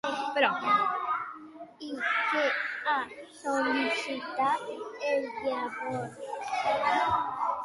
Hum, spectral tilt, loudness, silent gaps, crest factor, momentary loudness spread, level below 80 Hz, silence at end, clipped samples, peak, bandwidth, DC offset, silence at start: none; -3.5 dB/octave; -29 LUFS; none; 20 dB; 12 LU; -68 dBFS; 0 s; under 0.1%; -10 dBFS; 11.5 kHz; under 0.1%; 0.05 s